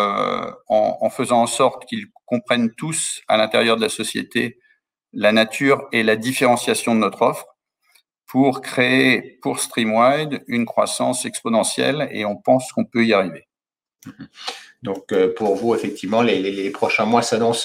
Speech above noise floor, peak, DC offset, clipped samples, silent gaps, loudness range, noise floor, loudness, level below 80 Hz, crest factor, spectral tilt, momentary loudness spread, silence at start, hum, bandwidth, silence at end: over 71 dB; -2 dBFS; under 0.1%; under 0.1%; none; 3 LU; under -90 dBFS; -19 LUFS; -66 dBFS; 18 dB; -4 dB/octave; 10 LU; 0 s; none; 16.5 kHz; 0 s